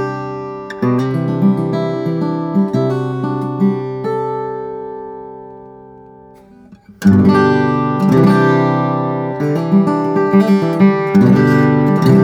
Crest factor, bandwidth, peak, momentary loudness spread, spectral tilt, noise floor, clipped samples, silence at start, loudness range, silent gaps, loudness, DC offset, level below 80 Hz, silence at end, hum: 14 dB; 9.6 kHz; 0 dBFS; 14 LU; -8.5 dB/octave; -41 dBFS; under 0.1%; 0 s; 9 LU; none; -14 LUFS; under 0.1%; -52 dBFS; 0 s; none